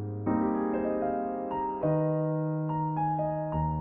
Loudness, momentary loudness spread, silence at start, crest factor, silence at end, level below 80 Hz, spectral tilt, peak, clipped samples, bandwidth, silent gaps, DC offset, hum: -30 LUFS; 4 LU; 0 s; 14 dB; 0 s; -50 dBFS; -10 dB/octave; -16 dBFS; under 0.1%; 3 kHz; none; under 0.1%; none